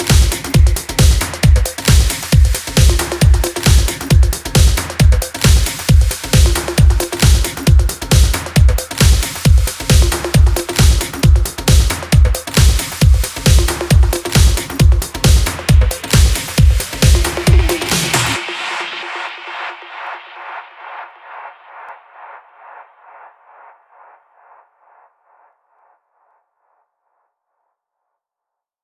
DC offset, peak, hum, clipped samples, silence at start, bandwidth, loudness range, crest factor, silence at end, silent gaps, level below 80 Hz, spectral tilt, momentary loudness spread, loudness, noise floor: under 0.1%; 0 dBFS; none; under 0.1%; 0 s; 16 kHz; 12 LU; 14 dB; 6.45 s; none; -16 dBFS; -4.5 dB/octave; 13 LU; -13 LUFS; -83 dBFS